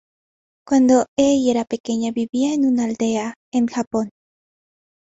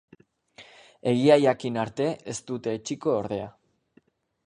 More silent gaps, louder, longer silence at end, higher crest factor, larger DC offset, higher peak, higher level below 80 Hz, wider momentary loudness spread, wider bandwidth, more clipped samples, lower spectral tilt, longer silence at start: first, 1.08-1.17 s, 1.80-1.84 s, 2.29-2.33 s, 3.36-3.52 s, 3.87-3.91 s vs none; first, -19 LUFS vs -26 LUFS; about the same, 1.05 s vs 1 s; second, 16 dB vs 22 dB; neither; about the same, -4 dBFS vs -6 dBFS; first, -58 dBFS vs -66 dBFS; second, 9 LU vs 14 LU; second, 8 kHz vs 11 kHz; neither; about the same, -4.5 dB/octave vs -5.5 dB/octave; about the same, 0.7 s vs 0.6 s